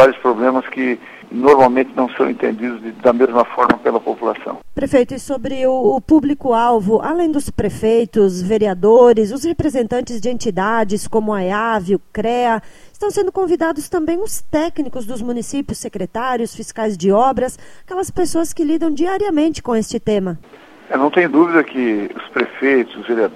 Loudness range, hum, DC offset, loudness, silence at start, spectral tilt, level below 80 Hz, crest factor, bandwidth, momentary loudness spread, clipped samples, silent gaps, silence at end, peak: 5 LU; none; under 0.1%; -17 LUFS; 0 s; -5.5 dB/octave; -44 dBFS; 16 dB; 14.5 kHz; 10 LU; under 0.1%; none; 0 s; 0 dBFS